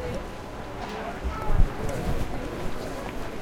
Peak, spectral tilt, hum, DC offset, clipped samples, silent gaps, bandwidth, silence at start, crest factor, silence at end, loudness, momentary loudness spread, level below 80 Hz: -6 dBFS; -6 dB/octave; none; under 0.1%; under 0.1%; none; 15 kHz; 0 s; 20 dB; 0 s; -32 LUFS; 8 LU; -30 dBFS